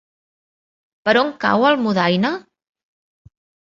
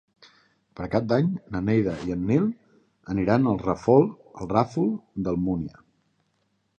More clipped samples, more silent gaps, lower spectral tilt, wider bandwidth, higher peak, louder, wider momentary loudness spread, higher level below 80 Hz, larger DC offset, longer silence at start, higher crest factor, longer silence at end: neither; neither; second, -6.5 dB/octave vs -9 dB/octave; second, 7.4 kHz vs 8.6 kHz; first, -2 dBFS vs -6 dBFS; first, -17 LUFS vs -25 LUFS; second, 8 LU vs 11 LU; second, -62 dBFS vs -50 dBFS; neither; first, 1.05 s vs 0.8 s; about the same, 18 dB vs 20 dB; first, 1.35 s vs 1.1 s